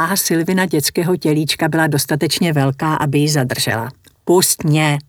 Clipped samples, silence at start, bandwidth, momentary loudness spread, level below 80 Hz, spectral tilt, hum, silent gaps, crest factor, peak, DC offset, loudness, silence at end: under 0.1%; 0 s; over 20 kHz; 4 LU; -54 dBFS; -4.5 dB/octave; none; none; 14 dB; -2 dBFS; under 0.1%; -16 LUFS; 0.05 s